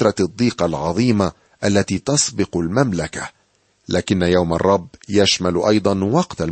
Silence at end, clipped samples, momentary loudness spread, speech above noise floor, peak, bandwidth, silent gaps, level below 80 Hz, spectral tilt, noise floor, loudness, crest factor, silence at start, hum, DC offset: 0 s; under 0.1%; 7 LU; 43 dB; -2 dBFS; 8.8 kHz; none; -44 dBFS; -5 dB/octave; -61 dBFS; -18 LUFS; 16 dB; 0 s; none; under 0.1%